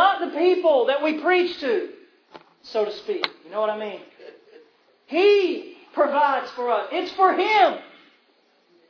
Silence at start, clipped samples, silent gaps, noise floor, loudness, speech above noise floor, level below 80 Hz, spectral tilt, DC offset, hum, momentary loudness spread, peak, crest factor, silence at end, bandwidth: 0 s; under 0.1%; none; -62 dBFS; -22 LUFS; 41 dB; -72 dBFS; -4 dB/octave; under 0.1%; none; 13 LU; -2 dBFS; 20 dB; 1.05 s; 5.4 kHz